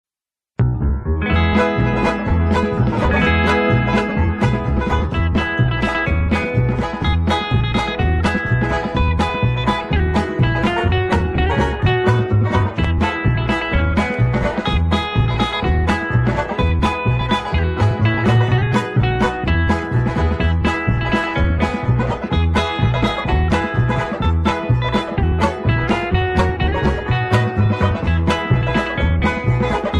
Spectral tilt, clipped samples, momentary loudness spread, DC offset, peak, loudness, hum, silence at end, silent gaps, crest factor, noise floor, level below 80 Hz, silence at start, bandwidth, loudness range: -7 dB/octave; under 0.1%; 3 LU; under 0.1%; -2 dBFS; -18 LUFS; none; 0 s; none; 14 dB; under -90 dBFS; -24 dBFS; 0.6 s; 10 kHz; 1 LU